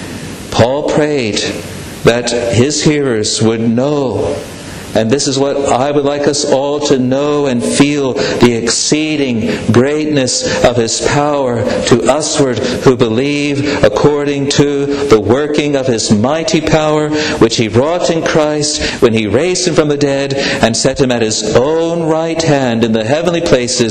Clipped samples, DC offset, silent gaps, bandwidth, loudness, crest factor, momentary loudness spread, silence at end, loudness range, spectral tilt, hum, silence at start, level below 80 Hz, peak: under 0.1%; under 0.1%; none; 13 kHz; -12 LUFS; 12 dB; 3 LU; 0 s; 2 LU; -4.5 dB/octave; none; 0 s; -38 dBFS; 0 dBFS